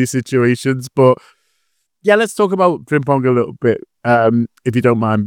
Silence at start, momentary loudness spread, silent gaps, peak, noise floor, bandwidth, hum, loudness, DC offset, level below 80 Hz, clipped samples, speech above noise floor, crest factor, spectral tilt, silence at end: 0 s; 5 LU; none; 0 dBFS; -68 dBFS; 16.5 kHz; none; -15 LUFS; under 0.1%; -58 dBFS; under 0.1%; 54 dB; 14 dB; -6.5 dB/octave; 0 s